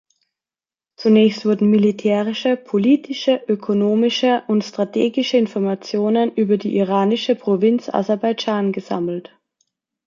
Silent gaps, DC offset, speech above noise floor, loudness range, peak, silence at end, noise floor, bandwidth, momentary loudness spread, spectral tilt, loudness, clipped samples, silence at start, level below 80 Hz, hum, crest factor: none; under 0.1%; over 73 dB; 2 LU; -2 dBFS; 0.85 s; under -90 dBFS; 7.4 kHz; 6 LU; -6.5 dB/octave; -18 LUFS; under 0.1%; 1 s; -66 dBFS; none; 16 dB